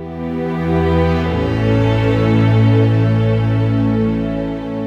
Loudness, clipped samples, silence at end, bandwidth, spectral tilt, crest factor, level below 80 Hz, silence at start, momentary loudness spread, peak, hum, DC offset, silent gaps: -15 LUFS; under 0.1%; 0 s; 6 kHz; -9 dB/octave; 12 dB; -30 dBFS; 0 s; 8 LU; -2 dBFS; none; under 0.1%; none